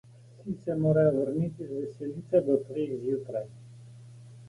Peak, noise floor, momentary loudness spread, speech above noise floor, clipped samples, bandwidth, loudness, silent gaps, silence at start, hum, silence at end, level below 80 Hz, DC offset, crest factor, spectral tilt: -12 dBFS; -49 dBFS; 26 LU; 20 dB; under 0.1%; 11 kHz; -29 LUFS; none; 0.35 s; none; 0 s; -64 dBFS; under 0.1%; 18 dB; -10 dB/octave